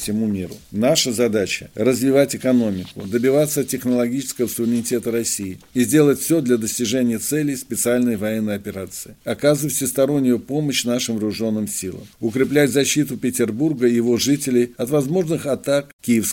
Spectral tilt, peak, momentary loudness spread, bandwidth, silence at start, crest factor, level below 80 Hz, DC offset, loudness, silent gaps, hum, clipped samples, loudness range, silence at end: -4.5 dB/octave; -2 dBFS; 8 LU; 17 kHz; 0 s; 18 dB; -56 dBFS; under 0.1%; -20 LUFS; 15.93-15.99 s; none; under 0.1%; 2 LU; 0 s